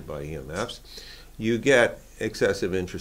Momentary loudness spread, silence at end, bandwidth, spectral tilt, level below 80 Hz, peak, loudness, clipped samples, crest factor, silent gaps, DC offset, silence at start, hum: 20 LU; 0 s; 16.5 kHz; -4.5 dB/octave; -48 dBFS; -4 dBFS; -25 LUFS; under 0.1%; 22 dB; none; under 0.1%; 0 s; none